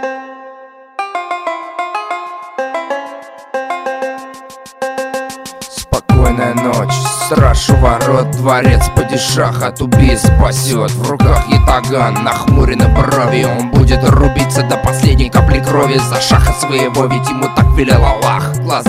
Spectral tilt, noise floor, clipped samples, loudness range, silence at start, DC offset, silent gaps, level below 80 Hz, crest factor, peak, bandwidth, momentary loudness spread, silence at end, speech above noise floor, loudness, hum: -5.5 dB/octave; -36 dBFS; under 0.1%; 11 LU; 0 s; under 0.1%; none; -18 dBFS; 12 dB; 0 dBFS; 16 kHz; 13 LU; 0 s; 26 dB; -12 LUFS; none